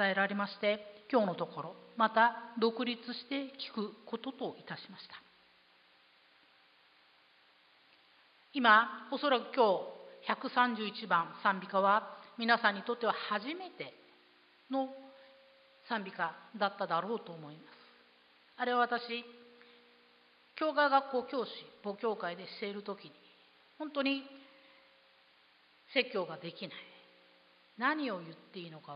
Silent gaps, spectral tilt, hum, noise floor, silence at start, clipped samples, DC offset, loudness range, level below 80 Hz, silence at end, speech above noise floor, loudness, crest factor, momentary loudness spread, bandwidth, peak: none; -1.5 dB/octave; none; -66 dBFS; 0 s; under 0.1%; under 0.1%; 10 LU; under -90 dBFS; 0 s; 32 dB; -34 LUFS; 24 dB; 18 LU; 5.2 kHz; -12 dBFS